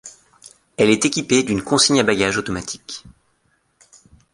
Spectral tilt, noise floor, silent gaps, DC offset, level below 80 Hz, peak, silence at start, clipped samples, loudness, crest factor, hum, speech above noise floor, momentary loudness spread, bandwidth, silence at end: -3 dB/octave; -65 dBFS; none; under 0.1%; -50 dBFS; 0 dBFS; 0.05 s; under 0.1%; -17 LUFS; 20 dB; none; 46 dB; 18 LU; 11.5 kHz; 1.2 s